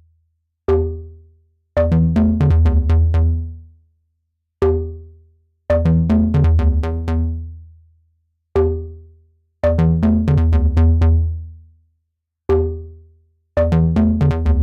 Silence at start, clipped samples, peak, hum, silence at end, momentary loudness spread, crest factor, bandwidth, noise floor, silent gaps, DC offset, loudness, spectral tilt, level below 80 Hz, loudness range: 0.7 s; under 0.1%; -6 dBFS; none; 0 s; 15 LU; 12 dB; 4.5 kHz; -75 dBFS; none; under 0.1%; -17 LUFS; -10.5 dB/octave; -26 dBFS; 3 LU